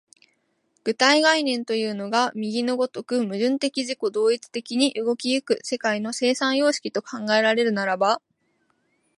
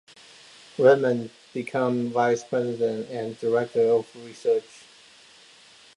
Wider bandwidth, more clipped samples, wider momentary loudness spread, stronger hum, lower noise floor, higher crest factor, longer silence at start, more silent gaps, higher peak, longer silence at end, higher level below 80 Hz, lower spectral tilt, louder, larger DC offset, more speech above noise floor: about the same, 11.5 kHz vs 11 kHz; neither; second, 8 LU vs 13 LU; neither; first, -70 dBFS vs -52 dBFS; about the same, 20 dB vs 20 dB; about the same, 0.85 s vs 0.8 s; neither; about the same, -4 dBFS vs -6 dBFS; second, 1 s vs 1.35 s; about the same, -76 dBFS vs -74 dBFS; second, -3 dB/octave vs -6 dB/octave; about the same, -23 LUFS vs -24 LUFS; neither; first, 47 dB vs 29 dB